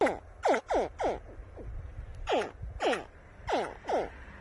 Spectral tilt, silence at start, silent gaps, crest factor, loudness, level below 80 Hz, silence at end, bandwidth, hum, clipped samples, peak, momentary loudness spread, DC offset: -5 dB/octave; 0 s; none; 20 dB; -33 LUFS; -48 dBFS; 0 s; 11.5 kHz; none; under 0.1%; -14 dBFS; 15 LU; under 0.1%